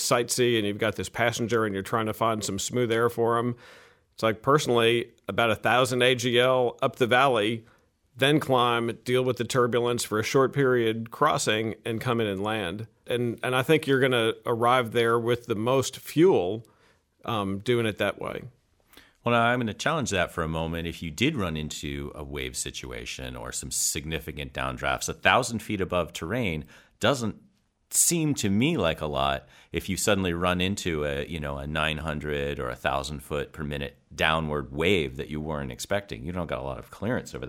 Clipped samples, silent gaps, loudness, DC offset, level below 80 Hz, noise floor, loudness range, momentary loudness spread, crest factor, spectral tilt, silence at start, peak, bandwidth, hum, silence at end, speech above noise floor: under 0.1%; none; -26 LUFS; under 0.1%; -48 dBFS; -63 dBFS; 6 LU; 12 LU; 24 dB; -4 dB/octave; 0 s; -4 dBFS; 17 kHz; none; 0 s; 37 dB